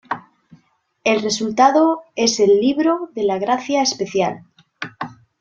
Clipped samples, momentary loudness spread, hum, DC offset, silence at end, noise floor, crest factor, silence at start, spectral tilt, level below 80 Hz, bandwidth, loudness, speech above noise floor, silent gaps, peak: under 0.1%; 17 LU; none; under 0.1%; 0.3 s; -60 dBFS; 18 dB; 0.1 s; -3.5 dB/octave; -62 dBFS; 8 kHz; -17 LUFS; 43 dB; none; -2 dBFS